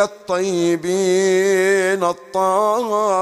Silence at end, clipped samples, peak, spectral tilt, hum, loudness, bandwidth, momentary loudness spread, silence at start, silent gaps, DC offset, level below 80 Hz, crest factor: 0 s; under 0.1%; -4 dBFS; -4.5 dB/octave; none; -17 LUFS; 14 kHz; 5 LU; 0 s; none; under 0.1%; -64 dBFS; 12 dB